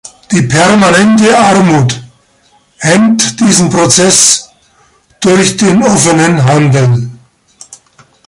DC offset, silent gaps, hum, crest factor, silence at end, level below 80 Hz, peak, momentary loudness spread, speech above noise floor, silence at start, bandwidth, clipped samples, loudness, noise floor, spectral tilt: under 0.1%; none; none; 8 dB; 0.55 s; -44 dBFS; 0 dBFS; 9 LU; 42 dB; 0.3 s; 16 kHz; 0.3%; -7 LUFS; -49 dBFS; -4 dB/octave